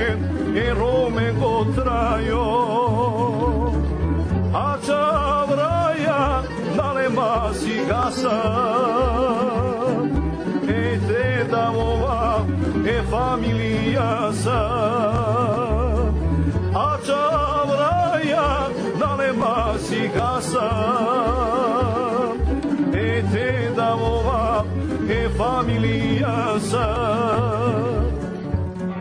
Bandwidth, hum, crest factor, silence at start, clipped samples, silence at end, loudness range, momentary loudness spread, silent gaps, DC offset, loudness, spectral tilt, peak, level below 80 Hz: 10.5 kHz; none; 10 dB; 0 s; under 0.1%; 0 s; 1 LU; 3 LU; none; under 0.1%; -21 LUFS; -6.5 dB/octave; -10 dBFS; -30 dBFS